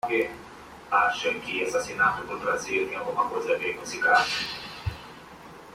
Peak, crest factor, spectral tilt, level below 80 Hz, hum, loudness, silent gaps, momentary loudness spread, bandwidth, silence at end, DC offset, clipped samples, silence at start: -8 dBFS; 20 dB; -3 dB/octave; -54 dBFS; none; -26 LUFS; none; 22 LU; 16 kHz; 0 s; under 0.1%; under 0.1%; 0.05 s